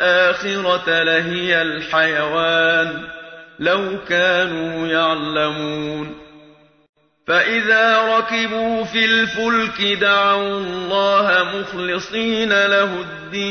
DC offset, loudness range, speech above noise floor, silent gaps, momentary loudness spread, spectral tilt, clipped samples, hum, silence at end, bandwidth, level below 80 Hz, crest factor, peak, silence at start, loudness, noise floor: under 0.1%; 4 LU; 31 dB; 6.89-6.93 s; 10 LU; -4 dB/octave; under 0.1%; none; 0 s; 6.6 kHz; -54 dBFS; 16 dB; -2 dBFS; 0 s; -17 LUFS; -49 dBFS